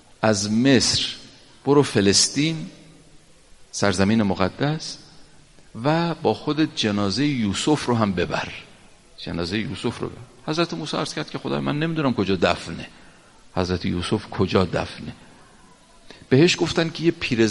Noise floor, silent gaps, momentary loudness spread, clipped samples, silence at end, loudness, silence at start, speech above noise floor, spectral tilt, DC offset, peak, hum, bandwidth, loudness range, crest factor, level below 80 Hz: -50 dBFS; none; 16 LU; under 0.1%; 0 s; -22 LUFS; 0.2 s; 29 dB; -4.5 dB/octave; under 0.1%; -2 dBFS; none; 11.5 kHz; 6 LU; 20 dB; -52 dBFS